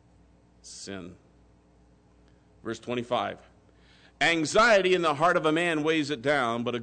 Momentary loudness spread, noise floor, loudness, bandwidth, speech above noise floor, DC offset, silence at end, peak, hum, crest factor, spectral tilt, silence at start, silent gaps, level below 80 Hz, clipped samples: 21 LU; -60 dBFS; -25 LUFS; 9.4 kHz; 34 dB; under 0.1%; 0 s; -12 dBFS; none; 16 dB; -4 dB/octave; 0.65 s; none; -60 dBFS; under 0.1%